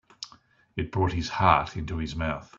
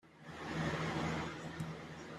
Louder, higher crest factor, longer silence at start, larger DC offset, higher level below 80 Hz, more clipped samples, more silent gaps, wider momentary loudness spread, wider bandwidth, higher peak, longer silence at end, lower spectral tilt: first, -27 LUFS vs -41 LUFS; first, 24 dB vs 16 dB; first, 0.2 s vs 0.05 s; neither; first, -44 dBFS vs -62 dBFS; neither; neither; first, 20 LU vs 10 LU; second, 7.6 kHz vs 13 kHz; first, -4 dBFS vs -26 dBFS; first, 0.15 s vs 0 s; about the same, -6 dB/octave vs -5.5 dB/octave